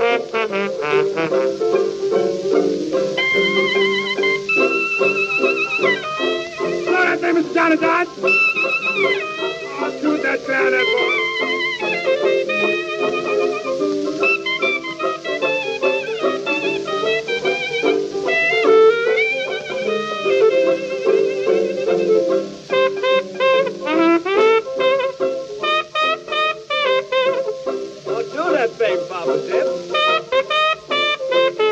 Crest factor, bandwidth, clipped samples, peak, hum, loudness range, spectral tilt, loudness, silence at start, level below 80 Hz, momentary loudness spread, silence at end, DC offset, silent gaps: 14 dB; 8.4 kHz; under 0.1%; -4 dBFS; none; 3 LU; -4 dB/octave; -18 LUFS; 0 s; -62 dBFS; 6 LU; 0 s; under 0.1%; none